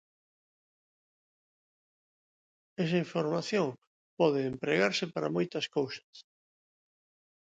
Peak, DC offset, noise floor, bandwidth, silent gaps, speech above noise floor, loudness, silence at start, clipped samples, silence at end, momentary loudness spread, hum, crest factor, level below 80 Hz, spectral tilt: -14 dBFS; under 0.1%; under -90 dBFS; 9.2 kHz; 3.87-4.17 s, 6.04-6.13 s; over 59 dB; -31 LUFS; 2.8 s; under 0.1%; 1.2 s; 8 LU; none; 22 dB; -76 dBFS; -5.5 dB/octave